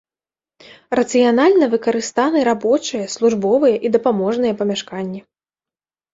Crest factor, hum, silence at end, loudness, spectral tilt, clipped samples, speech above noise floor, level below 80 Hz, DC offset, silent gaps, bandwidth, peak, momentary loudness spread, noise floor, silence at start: 16 dB; none; 0.95 s; -17 LUFS; -4.5 dB/octave; under 0.1%; over 74 dB; -60 dBFS; under 0.1%; none; 8 kHz; -2 dBFS; 11 LU; under -90 dBFS; 0.9 s